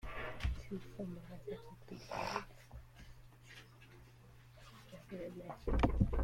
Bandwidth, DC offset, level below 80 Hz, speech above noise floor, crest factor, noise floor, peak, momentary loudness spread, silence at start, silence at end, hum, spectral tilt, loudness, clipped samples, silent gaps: 16 kHz; under 0.1%; -46 dBFS; 21 dB; 24 dB; -60 dBFS; -18 dBFS; 24 LU; 0.05 s; 0 s; none; -7 dB/octave; -43 LUFS; under 0.1%; none